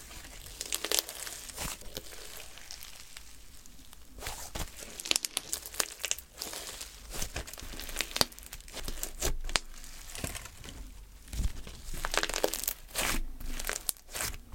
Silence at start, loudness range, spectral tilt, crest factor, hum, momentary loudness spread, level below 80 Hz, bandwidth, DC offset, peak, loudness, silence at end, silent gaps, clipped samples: 0 s; 6 LU; -1.5 dB/octave; 34 dB; none; 17 LU; -42 dBFS; 17 kHz; under 0.1%; -2 dBFS; -35 LUFS; 0 s; none; under 0.1%